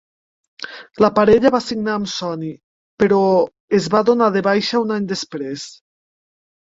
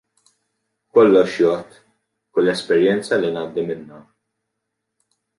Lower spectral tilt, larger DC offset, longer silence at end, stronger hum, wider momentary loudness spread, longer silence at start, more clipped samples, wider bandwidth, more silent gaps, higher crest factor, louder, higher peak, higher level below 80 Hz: about the same, -5.5 dB/octave vs -6 dB/octave; neither; second, 1 s vs 1.4 s; neither; first, 17 LU vs 13 LU; second, 0.6 s vs 0.95 s; neither; second, 7.8 kHz vs 11.5 kHz; first, 2.64-2.97 s, 3.60-3.68 s vs none; about the same, 18 dB vs 18 dB; about the same, -17 LUFS vs -18 LUFS; about the same, -2 dBFS vs -2 dBFS; first, -54 dBFS vs -64 dBFS